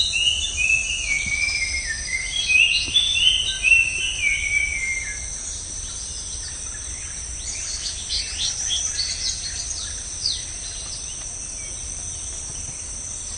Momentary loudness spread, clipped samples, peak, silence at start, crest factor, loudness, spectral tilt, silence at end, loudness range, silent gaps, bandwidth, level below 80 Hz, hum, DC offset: 14 LU; under 0.1%; -4 dBFS; 0 s; 20 dB; -21 LUFS; 1 dB/octave; 0 s; 10 LU; none; 11.5 kHz; -40 dBFS; none; under 0.1%